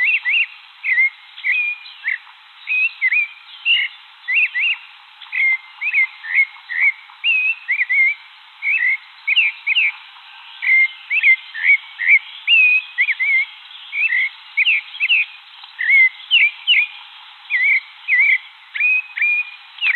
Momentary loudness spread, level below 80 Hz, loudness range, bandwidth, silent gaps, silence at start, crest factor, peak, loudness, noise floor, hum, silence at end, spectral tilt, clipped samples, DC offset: 11 LU; under -90 dBFS; 4 LU; 4.4 kHz; none; 0 s; 16 dB; -4 dBFS; -15 LUFS; -43 dBFS; none; 0 s; 5.5 dB/octave; under 0.1%; under 0.1%